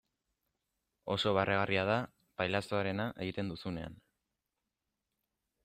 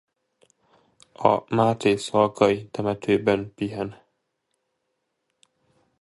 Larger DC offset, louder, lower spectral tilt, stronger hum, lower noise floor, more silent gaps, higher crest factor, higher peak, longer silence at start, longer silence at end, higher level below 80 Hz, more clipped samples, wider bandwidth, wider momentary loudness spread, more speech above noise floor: neither; second, -34 LUFS vs -23 LUFS; about the same, -6 dB/octave vs -6 dB/octave; neither; first, -88 dBFS vs -77 dBFS; neither; about the same, 22 dB vs 24 dB; second, -16 dBFS vs -2 dBFS; second, 1.05 s vs 1.2 s; second, 1.7 s vs 2.05 s; second, -66 dBFS vs -60 dBFS; neither; first, 14 kHz vs 11.5 kHz; first, 13 LU vs 9 LU; about the same, 54 dB vs 55 dB